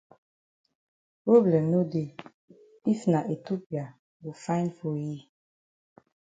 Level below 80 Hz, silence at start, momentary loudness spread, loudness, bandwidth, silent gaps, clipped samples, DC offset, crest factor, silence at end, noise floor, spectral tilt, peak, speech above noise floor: -74 dBFS; 1.25 s; 21 LU; -27 LUFS; 9 kHz; 2.34-2.48 s, 3.66-3.70 s, 3.99-4.20 s; under 0.1%; under 0.1%; 22 dB; 1.2 s; under -90 dBFS; -8.5 dB/octave; -8 dBFS; over 64 dB